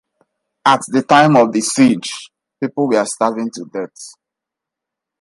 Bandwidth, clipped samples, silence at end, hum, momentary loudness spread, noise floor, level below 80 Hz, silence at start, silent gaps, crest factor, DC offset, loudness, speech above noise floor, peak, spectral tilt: 11.5 kHz; under 0.1%; 1.1 s; none; 17 LU; -84 dBFS; -60 dBFS; 0.65 s; none; 16 dB; under 0.1%; -15 LUFS; 69 dB; 0 dBFS; -4.5 dB/octave